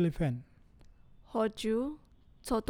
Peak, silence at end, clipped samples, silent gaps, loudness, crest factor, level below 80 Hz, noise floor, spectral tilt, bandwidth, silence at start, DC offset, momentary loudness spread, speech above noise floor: -18 dBFS; 0.05 s; under 0.1%; none; -34 LUFS; 16 dB; -52 dBFS; -58 dBFS; -6.5 dB/octave; 18 kHz; 0 s; under 0.1%; 14 LU; 26 dB